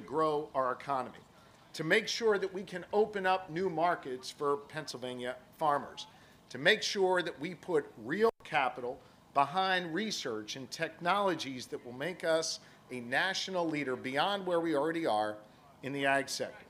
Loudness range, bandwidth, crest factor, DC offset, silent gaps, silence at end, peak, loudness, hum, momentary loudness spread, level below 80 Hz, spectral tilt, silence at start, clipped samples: 2 LU; 15.5 kHz; 22 dB; under 0.1%; none; 0.05 s; -10 dBFS; -33 LUFS; none; 12 LU; -74 dBFS; -3.5 dB/octave; 0 s; under 0.1%